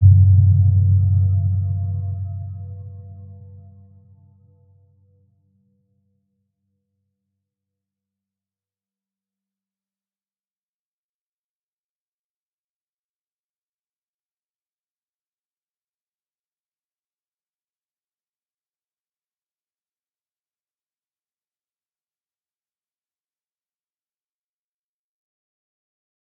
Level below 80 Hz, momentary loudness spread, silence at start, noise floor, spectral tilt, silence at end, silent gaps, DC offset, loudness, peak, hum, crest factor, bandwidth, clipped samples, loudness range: -52 dBFS; 25 LU; 0 s; under -90 dBFS; -17.5 dB/octave; 22.85 s; none; under 0.1%; -17 LUFS; -2 dBFS; none; 22 dB; 0.7 kHz; under 0.1%; 24 LU